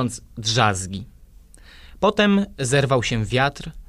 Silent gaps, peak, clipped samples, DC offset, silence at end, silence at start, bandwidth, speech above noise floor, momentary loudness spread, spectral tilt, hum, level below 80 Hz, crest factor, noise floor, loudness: none; -2 dBFS; under 0.1%; under 0.1%; 0.05 s; 0 s; 14 kHz; 26 dB; 9 LU; -4.5 dB/octave; none; -44 dBFS; 20 dB; -47 dBFS; -20 LUFS